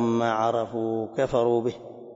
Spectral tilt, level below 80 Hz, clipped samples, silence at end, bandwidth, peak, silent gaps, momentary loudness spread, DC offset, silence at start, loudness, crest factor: -7 dB/octave; -58 dBFS; under 0.1%; 0 s; 7.8 kHz; -10 dBFS; none; 6 LU; under 0.1%; 0 s; -25 LUFS; 16 dB